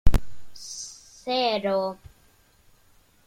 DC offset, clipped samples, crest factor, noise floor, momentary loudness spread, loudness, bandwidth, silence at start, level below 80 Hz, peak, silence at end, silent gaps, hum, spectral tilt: under 0.1%; under 0.1%; 20 dB; -59 dBFS; 19 LU; -28 LUFS; 13.5 kHz; 0.05 s; -32 dBFS; -4 dBFS; 1.35 s; none; none; -4.5 dB/octave